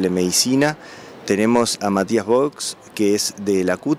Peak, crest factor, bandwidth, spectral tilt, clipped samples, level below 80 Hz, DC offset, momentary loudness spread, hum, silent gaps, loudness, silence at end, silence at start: -4 dBFS; 14 dB; 16 kHz; -4 dB/octave; under 0.1%; -60 dBFS; under 0.1%; 11 LU; none; none; -19 LUFS; 0 s; 0 s